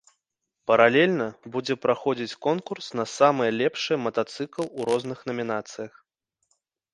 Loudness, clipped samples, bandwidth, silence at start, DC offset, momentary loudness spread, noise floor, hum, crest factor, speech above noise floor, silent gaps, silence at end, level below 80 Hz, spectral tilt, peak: -25 LUFS; under 0.1%; 11.5 kHz; 0.7 s; under 0.1%; 13 LU; -81 dBFS; none; 24 dB; 56 dB; none; 1.05 s; -72 dBFS; -5 dB/octave; -2 dBFS